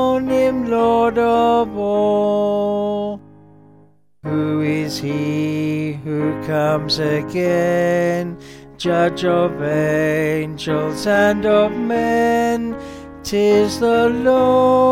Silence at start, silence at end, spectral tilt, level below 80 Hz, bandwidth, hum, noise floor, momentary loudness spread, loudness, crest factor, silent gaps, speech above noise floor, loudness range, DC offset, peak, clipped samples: 0 s; 0 s; -6 dB/octave; -48 dBFS; 16.5 kHz; none; -52 dBFS; 8 LU; -17 LUFS; 14 dB; none; 36 dB; 5 LU; under 0.1%; -4 dBFS; under 0.1%